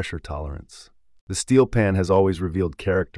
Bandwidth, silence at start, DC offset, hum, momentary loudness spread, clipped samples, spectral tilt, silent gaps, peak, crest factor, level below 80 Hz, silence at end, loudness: 12 kHz; 0 s; under 0.1%; none; 14 LU; under 0.1%; -6 dB/octave; 1.21-1.27 s; -6 dBFS; 16 dB; -42 dBFS; 0 s; -22 LUFS